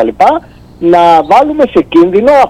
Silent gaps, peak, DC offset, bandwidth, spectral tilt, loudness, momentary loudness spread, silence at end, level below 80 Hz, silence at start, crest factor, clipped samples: none; 0 dBFS; under 0.1%; 10 kHz; -6.5 dB/octave; -7 LUFS; 5 LU; 0 s; -38 dBFS; 0 s; 8 dB; 3%